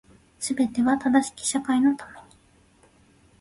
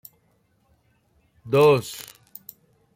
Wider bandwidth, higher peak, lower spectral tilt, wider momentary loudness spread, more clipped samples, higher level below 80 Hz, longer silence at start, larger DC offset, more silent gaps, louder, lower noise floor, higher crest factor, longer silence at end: second, 11.5 kHz vs 16.5 kHz; about the same, -8 dBFS vs -6 dBFS; second, -3 dB/octave vs -5.5 dB/octave; second, 12 LU vs 25 LU; neither; about the same, -60 dBFS vs -64 dBFS; second, 0.4 s vs 1.45 s; neither; neither; second, -24 LUFS vs -19 LUFS; second, -58 dBFS vs -65 dBFS; about the same, 18 dB vs 20 dB; first, 1.2 s vs 0.95 s